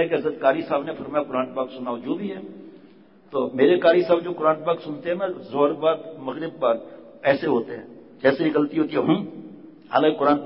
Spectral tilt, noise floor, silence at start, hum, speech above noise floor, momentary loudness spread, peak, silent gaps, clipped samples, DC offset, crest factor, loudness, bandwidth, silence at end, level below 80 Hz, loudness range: -10.5 dB/octave; -51 dBFS; 0 s; none; 29 dB; 14 LU; -6 dBFS; none; under 0.1%; under 0.1%; 18 dB; -23 LUFS; 5.8 kHz; 0 s; -66 dBFS; 4 LU